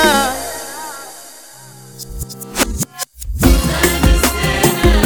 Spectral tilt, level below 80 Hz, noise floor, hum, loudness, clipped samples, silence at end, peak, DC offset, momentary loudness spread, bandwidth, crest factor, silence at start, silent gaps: -4 dB/octave; -20 dBFS; -38 dBFS; none; -15 LUFS; under 0.1%; 0 s; 0 dBFS; under 0.1%; 21 LU; over 20 kHz; 16 dB; 0 s; none